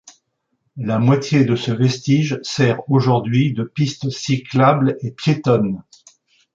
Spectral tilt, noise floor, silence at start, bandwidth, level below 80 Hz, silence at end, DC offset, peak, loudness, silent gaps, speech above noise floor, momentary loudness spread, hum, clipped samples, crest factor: -6.5 dB/octave; -70 dBFS; 0.05 s; 7.6 kHz; -56 dBFS; 0.75 s; under 0.1%; -2 dBFS; -18 LUFS; none; 53 dB; 7 LU; none; under 0.1%; 16 dB